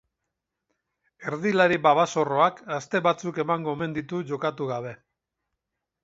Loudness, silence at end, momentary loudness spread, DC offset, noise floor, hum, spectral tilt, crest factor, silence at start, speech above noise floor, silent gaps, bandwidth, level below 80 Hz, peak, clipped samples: -25 LUFS; 1.1 s; 13 LU; under 0.1%; -83 dBFS; none; -5.5 dB/octave; 22 dB; 1.2 s; 59 dB; none; 8 kHz; -68 dBFS; -4 dBFS; under 0.1%